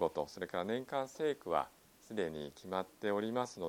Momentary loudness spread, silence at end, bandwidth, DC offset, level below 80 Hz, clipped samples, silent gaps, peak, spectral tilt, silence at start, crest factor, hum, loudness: 5 LU; 0 s; 17 kHz; under 0.1%; -72 dBFS; under 0.1%; none; -18 dBFS; -5 dB/octave; 0 s; 20 dB; none; -39 LUFS